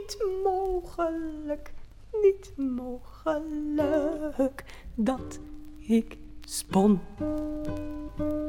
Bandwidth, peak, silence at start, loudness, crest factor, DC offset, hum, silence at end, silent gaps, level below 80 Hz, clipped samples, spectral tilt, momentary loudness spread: 16.5 kHz; -10 dBFS; 0 s; -29 LUFS; 18 dB; under 0.1%; none; 0 s; none; -46 dBFS; under 0.1%; -6 dB/octave; 15 LU